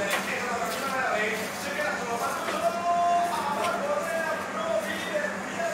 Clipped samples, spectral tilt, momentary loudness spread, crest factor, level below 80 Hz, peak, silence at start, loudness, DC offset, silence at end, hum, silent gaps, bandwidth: under 0.1%; -3 dB/octave; 4 LU; 14 dB; -66 dBFS; -14 dBFS; 0 s; -28 LUFS; under 0.1%; 0 s; none; none; 16 kHz